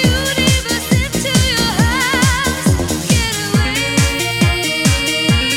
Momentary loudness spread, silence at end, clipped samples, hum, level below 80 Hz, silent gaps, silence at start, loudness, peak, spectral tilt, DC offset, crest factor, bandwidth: 2 LU; 0 s; under 0.1%; none; -26 dBFS; none; 0 s; -14 LUFS; 0 dBFS; -3.5 dB/octave; under 0.1%; 14 dB; 17.5 kHz